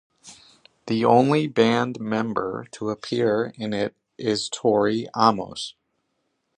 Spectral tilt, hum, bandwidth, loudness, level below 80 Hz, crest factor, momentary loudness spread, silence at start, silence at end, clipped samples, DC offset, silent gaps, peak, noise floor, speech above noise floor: -5.5 dB/octave; none; 10 kHz; -23 LUFS; -64 dBFS; 22 dB; 12 LU; 0.25 s; 0.85 s; under 0.1%; under 0.1%; none; -2 dBFS; -74 dBFS; 52 dB